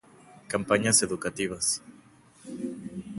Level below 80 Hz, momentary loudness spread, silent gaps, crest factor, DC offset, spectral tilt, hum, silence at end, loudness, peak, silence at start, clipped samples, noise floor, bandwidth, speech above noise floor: -60 dBFS; 16 LU; none; 24 dB; under 0.1%; -2.5 dB/octave; none; 0 s; -27 LUFS; -6 dBFS; 0.3 s; under 0.1%; -56 dBFS; 12 kHz; 29 dB